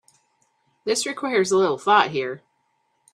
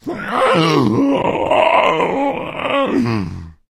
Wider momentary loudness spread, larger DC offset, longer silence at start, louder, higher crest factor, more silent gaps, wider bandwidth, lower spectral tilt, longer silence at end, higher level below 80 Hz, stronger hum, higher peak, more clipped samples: first, 14 LU vs 8 LU; neither; first, 0.85 s vs 0.05 s; second, -21 LUFS vs -16 LUFS; first, 22 dB vs 16 dB; neither; about the same, 13.5 kHz vs 13.5 kHz; second, -3 dB/octave vs -6 dB/octave; first, 0.75 s vs 0.2 s; second, -70 dBFS vs -46 dBFS; neither; about the same, -2 dBFS vs 0 dBFS; neither